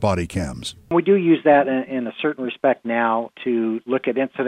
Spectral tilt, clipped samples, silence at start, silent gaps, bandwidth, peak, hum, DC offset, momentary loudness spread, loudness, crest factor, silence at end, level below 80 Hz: -6.5 dB/octave; under 0.1%; 0 s; none; 12 kHz; -4 dBFS; none; under 0.1%; 11 LU; -20 LUFS; 16 dB; 0 s; -50 dBFS